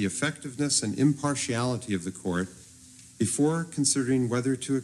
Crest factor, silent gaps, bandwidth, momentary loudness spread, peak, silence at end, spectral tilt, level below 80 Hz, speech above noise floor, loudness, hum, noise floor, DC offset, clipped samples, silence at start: 18 dB; none; 13 kHz; 7 LU; -10 dBFS; 0 s; -4.5 dB/octave; -64 dBFS; 24 dB; -27 LUFS; none; -51 dBFS; under 0.1%; under 0.1%; 0 s